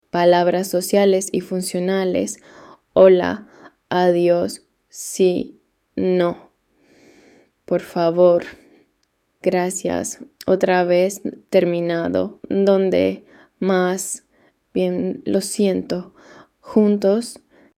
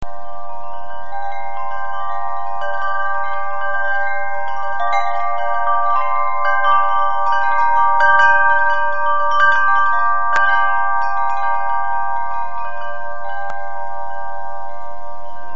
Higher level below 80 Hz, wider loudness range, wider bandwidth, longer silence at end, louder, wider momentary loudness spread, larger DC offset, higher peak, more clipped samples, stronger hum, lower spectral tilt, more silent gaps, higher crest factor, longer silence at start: second, -60 dBFS vs -52 dBFS; second, 4 LU vs 10 LU; first, 16 kHz vs 7.6 kHz; first, 0.45 s vs 0 s; about the same, -19 LUFS vs -18 LUFS; second, 13 LU vs 16 LU; second, under 0.1% vs 20%; about the same, -2 dBFS vs 0 dBFS; neither; neither; first, -5.5 dB/octave vs 0 dB/octave; neither; about the same, 18 dB vs 18 dB; first, 0.15 s vs 0 s